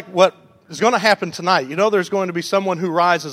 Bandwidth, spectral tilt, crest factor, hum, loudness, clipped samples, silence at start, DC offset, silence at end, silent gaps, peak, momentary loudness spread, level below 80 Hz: 15.5 kHz; -4.5 dB/octave; 18 dB; none; -18 LUFS; under 0.1%; 0 s; under 0.1%; 0 s; none; 0 dBFS; 5 LU; -68 dBFS